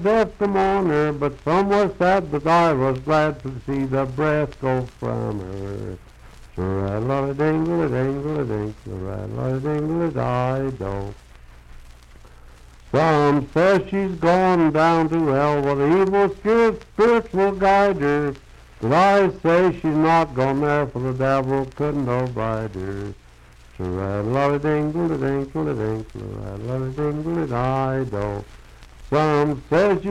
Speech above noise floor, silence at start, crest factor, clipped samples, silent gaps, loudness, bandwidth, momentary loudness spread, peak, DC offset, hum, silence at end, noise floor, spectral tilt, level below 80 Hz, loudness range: 27 dB; 0 s; 14 dB; under 0.1%; none; -21 LUFS; 12 kHz; 13 LU; -6 dBFS; under 0.1%; none; 0 s; -47 dBFS; -7.5 dB/octave; -42 dBFS; 7 LU